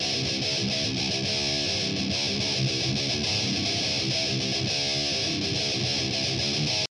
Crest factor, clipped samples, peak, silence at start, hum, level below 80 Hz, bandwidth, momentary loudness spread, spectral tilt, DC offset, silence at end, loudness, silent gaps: 14 dB; under 0.1%; -14 dBFS; 0 s; none; -50 dBFS; 12 kHz; 1 LU; -3 dB/octave; under 0.1%; 0.1 s; -25 LUFS; none